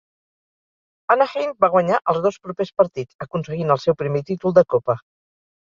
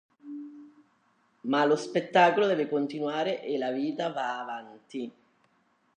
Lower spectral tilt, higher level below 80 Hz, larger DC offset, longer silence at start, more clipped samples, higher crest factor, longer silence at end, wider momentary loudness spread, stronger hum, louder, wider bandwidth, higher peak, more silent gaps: first, -7.5 dB/octave vs -5.5 dB/octave; first, -60 dBFS vs -86 dBFS; neither; first, 1.1 s vs 0.25 s; neither; about the same, 20 dB vs 20 dB; about the same, 0.75 s vs 0.85 s; second, 11 LU vs 20 LU; neither; first, -20 LUFS vs -28 LUFS; second, 7.2 kHz vs 9.8 kHz; first, 0 dBFS vs -10 dBFS; first, 3.14-3.19 s vs none